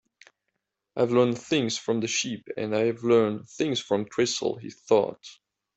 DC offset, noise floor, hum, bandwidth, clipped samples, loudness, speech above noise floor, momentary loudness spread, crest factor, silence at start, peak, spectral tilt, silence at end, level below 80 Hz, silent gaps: under 0.1%; -81 dBFS; none; 8.2 kHz; under 0.1%; -26 LUFS; 56 dB; 10 LU; 18 dB; 0.95 s; -8 dBFS; -4.5 dB/octave; 0.45 s; -68 dBFS; none